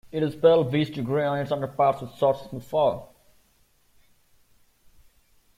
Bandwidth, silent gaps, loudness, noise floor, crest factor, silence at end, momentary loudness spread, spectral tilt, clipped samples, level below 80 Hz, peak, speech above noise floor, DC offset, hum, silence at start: 15.5 kHz; none; -24 LUFS; -63 dBFS; 20 dB; 2.5 s; 9 LU; -7.5 dB/octave; under 0.1%; -60 dBFS; -6 dBFS; 39 dB; under 0.1%; none; 0.15 s